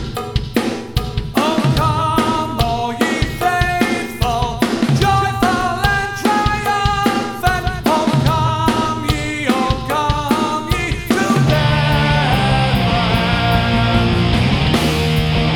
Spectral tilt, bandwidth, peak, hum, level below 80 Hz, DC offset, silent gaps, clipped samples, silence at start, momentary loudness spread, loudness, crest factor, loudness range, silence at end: -5.5 dB/octave; 19 kHz; 0 dBFS; none; -28 dBFS; under 0.1%; none; under 0.1%; 0 s; 5 LU; -16 LUFS; 16 dB; 2 LU; 0 s